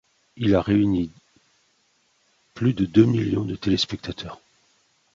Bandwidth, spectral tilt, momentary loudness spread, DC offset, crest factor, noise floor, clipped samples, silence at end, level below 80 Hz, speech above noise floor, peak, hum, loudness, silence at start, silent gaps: 7.8 kHz; -7 dB/octave; 15 LU; under 0.1%; 20 dB; -66 dBFS; under 0.1%; 0.8 s; -48 dBFS; 44 dB; -4 dBFS; none; -22 LUFS; 0.35 s; none